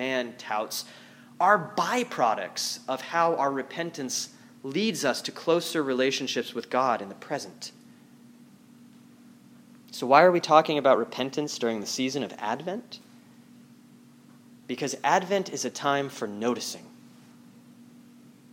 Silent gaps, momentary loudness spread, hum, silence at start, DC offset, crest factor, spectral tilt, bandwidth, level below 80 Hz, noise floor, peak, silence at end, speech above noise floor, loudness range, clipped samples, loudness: none; 14 LU; none; 0 s; under 0.1%; 26 dB; -3.5 dB/octave; 16.5 kHz; -84 dBFS; -53 dBFS; -4 dBFS; 0.7 s; 27 dB; 9 LU; under 0.1%; -27 LUFS